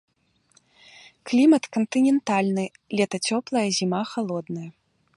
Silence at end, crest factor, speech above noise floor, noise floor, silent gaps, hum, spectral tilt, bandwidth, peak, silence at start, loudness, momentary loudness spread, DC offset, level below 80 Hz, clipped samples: 0.45 s; 16 dB; 40 dB; -63 dBFS; none; none; -5 dB/octave; 11.5 kHz; -8 dBFS; 1.25 s; -23 LUFS; 14 LU; under 0.1%; -72 dBFS; under 0.1%